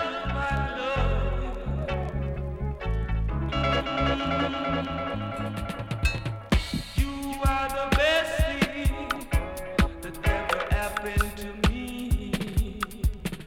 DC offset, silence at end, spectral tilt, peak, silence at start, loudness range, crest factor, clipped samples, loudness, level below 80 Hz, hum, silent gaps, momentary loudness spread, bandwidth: under 0.1%; 0 s; -5.5 dB/octave; -8 dBFS; 0 s; 3 LU; 20 dB; under 0.1%; -28 LUFS; -32 dBFS; none; none; 6 LU; 17 kHz